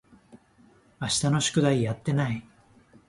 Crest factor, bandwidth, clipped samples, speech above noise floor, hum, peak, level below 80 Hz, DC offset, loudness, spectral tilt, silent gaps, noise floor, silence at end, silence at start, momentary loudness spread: 18 dB; 11.5 kHz; under 0.1%; 34 dB; none; -10 dBFS; -56 dBFS; under 0.1%; -26 LUFS; -4.5 dB/octave; none; -59 dBFS; 0.65 s; 0.35 s; 10 LU